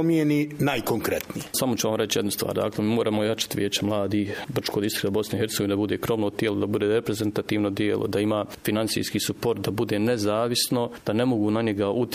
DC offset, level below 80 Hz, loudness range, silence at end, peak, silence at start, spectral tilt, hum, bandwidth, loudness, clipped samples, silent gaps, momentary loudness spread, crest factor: under 0.1%; -56 dBFS; 1 LU; 0 s; -10 dBFS; 0 s; -5 dB/octave; none; 15.5 kHz; -25 LUFS; under 0.1%; none; 4 LU; 16 dB